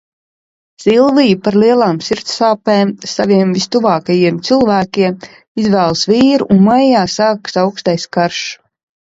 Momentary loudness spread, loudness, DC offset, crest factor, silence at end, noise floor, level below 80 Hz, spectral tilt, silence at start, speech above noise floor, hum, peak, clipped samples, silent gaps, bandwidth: 8 LU; -12 LUFS; under 0.1%; 12 dB; 0.5 s; under -90 dBFS; -50 dBFS; -5.5 dB/octave; 0.8 s; over 78 dB; none; 0 dBFS; under 0.1%; 5.48-5.55 s; 7.8 kHz